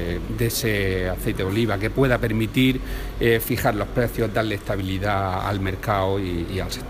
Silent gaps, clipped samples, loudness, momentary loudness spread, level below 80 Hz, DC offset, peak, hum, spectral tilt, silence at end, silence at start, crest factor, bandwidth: none; under 0.1%; -23 LUFS; 6 LU; -34 dBFS; under 0.1%; -4 dBFS; none; -5.5 dB/octave; 0 s; 0 s; 18 dB; 15.5 kHz